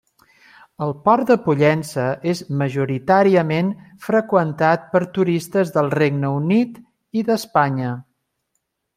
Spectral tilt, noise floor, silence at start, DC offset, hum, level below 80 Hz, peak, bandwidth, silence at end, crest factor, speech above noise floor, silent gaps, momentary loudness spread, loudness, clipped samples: -7 dB/octave; -74 dBFS; 0.8 s; under 0.1%; none; -60 dBFS; -2 dBFS; 16 kHz; 0.95 s; 18 dB; 56 dB; none; 9 LU; -19 LUFS; under 0.1%